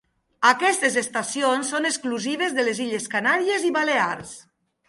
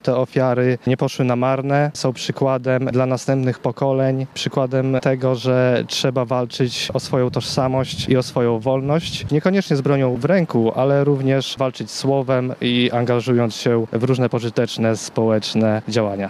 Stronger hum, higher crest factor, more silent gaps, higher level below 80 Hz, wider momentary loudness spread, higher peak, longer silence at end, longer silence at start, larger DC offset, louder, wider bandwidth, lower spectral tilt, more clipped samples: neither; about the same, 20 dB vs 16 dB; neither; second, -70 dBFS vs -54 dBFS; first, 7 LU vs 4 LU; about the same, -2 dBFS vs -2 dBFS; first, 0.45 s vs 0 s; first, 0.4 s vs 0.05 s; neither; second, -22 LUFS vs -19 LUFS; second, 11.5 kHz vs 13.5 kHz; second, -2 dB/octave vs -6 dB/octave; neither